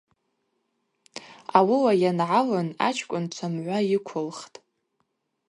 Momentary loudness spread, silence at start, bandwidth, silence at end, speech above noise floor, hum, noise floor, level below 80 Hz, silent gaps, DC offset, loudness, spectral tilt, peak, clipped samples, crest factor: 20 LU; 1.15 s; 11.5 kHz; 1.05 s; 51 dB; none; -75 dBFS; -74 dBFS; none; under 0.1%; -24 LUFS; -6 dB/octave; -2 dBFS; under 0.1%; 24 dB